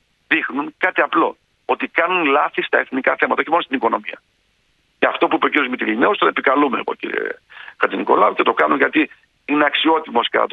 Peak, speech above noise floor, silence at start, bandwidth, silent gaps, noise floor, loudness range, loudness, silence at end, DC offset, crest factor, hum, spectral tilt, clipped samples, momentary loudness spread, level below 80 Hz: 0 dBFS; 45 dB; 0.3 s; 5 kHz; none; -63 dBFS; 2 LU; -18 LUFS; 0.05 s; under 0.1%; 18 dB; none; -6 dB/octave; under 0.1%; 9 LU; -66 dBFS